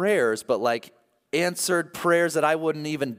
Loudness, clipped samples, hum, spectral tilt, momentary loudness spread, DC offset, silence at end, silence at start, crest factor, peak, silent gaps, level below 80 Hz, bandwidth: -24 LUFS; under 0.1%; none; -4 dB/octave; 6 LU; under 0.1%; 0.05 s; 0 s; 16 dB; -8 dBFS; none; -74 dBFS; 16 kHz